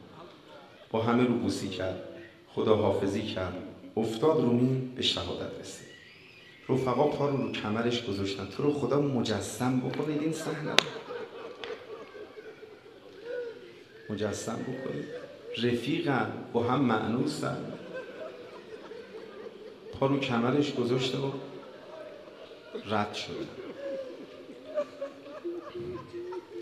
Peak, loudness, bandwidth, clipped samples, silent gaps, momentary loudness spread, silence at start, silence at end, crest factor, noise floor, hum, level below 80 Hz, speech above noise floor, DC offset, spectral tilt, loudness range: 0 dBFS; -31 LUFS; 13.5 kHz; under 0.1%; none; 20 LU; 0 s; 0 s; 32 dB; -53 dBFS; none; -68 dBFS; 23 dB; under 0.1%; -5.5 dB/octave; 9 LU